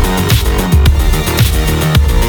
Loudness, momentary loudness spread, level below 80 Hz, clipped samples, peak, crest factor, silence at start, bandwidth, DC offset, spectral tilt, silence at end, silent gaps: -12 LUFS; 3 LU; -12 dBFS; under 0.1%; 0 dBFS; 10 dB; 0 s; over 20 kHz; under 0.1%; -5 dB/octave; 0 s; none